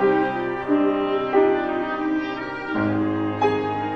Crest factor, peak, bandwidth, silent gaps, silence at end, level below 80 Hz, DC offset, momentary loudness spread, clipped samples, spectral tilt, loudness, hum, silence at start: 16 dB; -6 dBFS; 6.4 kHz; none; 0 s; -54 dBFS; 0.1%; 7 LU; under 0.1%; -8 dB/octave; -22 LUFS; none; 0 s